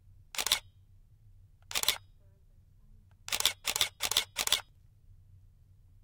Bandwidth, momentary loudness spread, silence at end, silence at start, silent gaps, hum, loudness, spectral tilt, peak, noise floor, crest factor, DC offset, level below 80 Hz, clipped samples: 19 kHz; 8 LU; 0.9 s; 0.1 s; none; none; -31 LUFS; 1 dB/octave; -8 dBFS; -60 dBFS; 30 dB; under 0.1%; -60 dBFS; under 0.1%